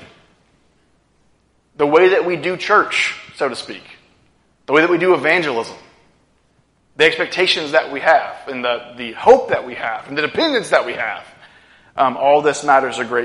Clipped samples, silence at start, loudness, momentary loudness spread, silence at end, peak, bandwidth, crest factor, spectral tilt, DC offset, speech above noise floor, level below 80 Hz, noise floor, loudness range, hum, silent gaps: under 0.1%; 0 s; -16 LUFS; 12 LU; 0 s; 0 dBFS; 11.5 kHz; 18 dB; -3.5 dB/octave; under 0.1%; 43 dB; -60 dBFS; -59 dBFS; 2 LU; none; none